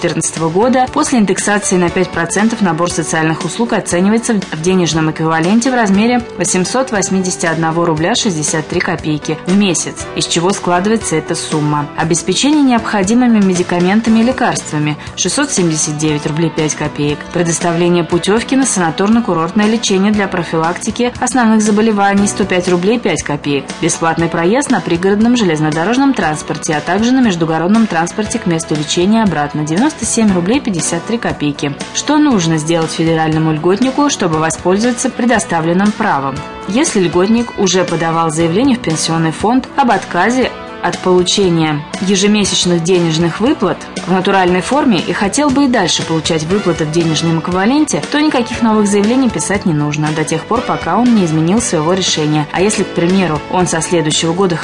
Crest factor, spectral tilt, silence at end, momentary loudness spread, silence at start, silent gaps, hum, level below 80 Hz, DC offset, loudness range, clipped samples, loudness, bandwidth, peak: 12 dB; -4.5 dB/octave; 0 s; 5 LU; 0 s; none; none; -42 dBFS; 0.2%; 2 LU; under 0.1%; -13 LUFS; 11 kHz; -2 dBFS